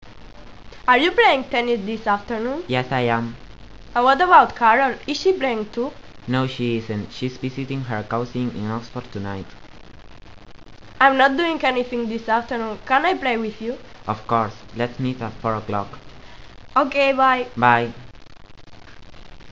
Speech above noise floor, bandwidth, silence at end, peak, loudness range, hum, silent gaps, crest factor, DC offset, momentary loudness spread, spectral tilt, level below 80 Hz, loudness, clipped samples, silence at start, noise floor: 22 dB; 8 kHz; 0 s; 0 dBFS; 8 LU; none; none; 22 dB; 0.7%; 14 LU; -6 dB/octave; -48 dBFS; -20 LUFS; under 0.1%; 0 s; -43 dBFS